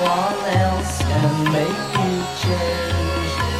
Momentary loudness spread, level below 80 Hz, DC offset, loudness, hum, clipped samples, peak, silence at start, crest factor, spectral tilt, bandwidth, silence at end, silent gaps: 3 LU; -34 dBFS; 0.2%; -20 LUFS; none; under 0.1%; -6 dBFS; 0 s; 14 dB; -5.5 dB/octave; 15.5 kHz; 0 s; none